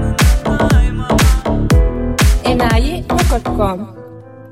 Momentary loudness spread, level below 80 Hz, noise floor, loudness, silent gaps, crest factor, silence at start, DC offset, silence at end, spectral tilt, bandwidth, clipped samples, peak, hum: 5 LU; -16 dBFS; -34 dBFS; -14 LUFS; none; 12 dB; 0 s; 0.2%; 0.05 s; -5.5 dB/octave; 16.5 kHz; under 0.1%; -2 dBFS; none